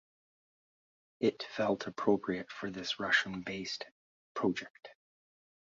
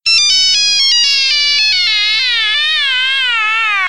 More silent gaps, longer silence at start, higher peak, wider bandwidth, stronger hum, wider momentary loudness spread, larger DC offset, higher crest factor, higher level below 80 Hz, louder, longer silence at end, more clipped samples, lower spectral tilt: first, 3.91-4.35 s, 4.70-4.74 s vs none; first, 1.2 s vs 0.05 s; second, -14 dBFS vs 0 dBFS; second, 7.6 kHz vs 16 kHz; neither; first, 12 LU vs 3 LU; second, under 0.1% vs 1%; first, 22 dB vs 12 dB; second, -72 dBFS vs -54 dBFS; second, -34 LUFS vs -9 LUFS; first, 0.85 s vs 0 s; neither; first, -2.5 dB/octave vs 4 dB/octave